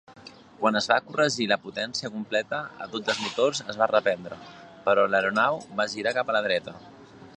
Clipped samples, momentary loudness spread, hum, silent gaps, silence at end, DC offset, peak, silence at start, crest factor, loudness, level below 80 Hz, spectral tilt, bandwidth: under 0.1%; 10 LU; none; none; 0.05 s; under 0.1%; -6 dBFS; 0.1 s; 22 dB; -26 LUFS; -68 dBFS; -3.5 dB/octave; 10 kHz